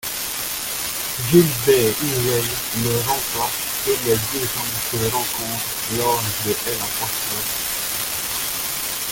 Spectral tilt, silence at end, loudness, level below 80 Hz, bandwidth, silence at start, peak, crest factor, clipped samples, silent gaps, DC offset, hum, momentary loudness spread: -3 dB/octave; 0 s; -20 LUFS; -46 dBFS; 17 kHz; 0 s; -2 dBFS; 20 dB; under 0.1%; none; under 0.1%; none; 7 LU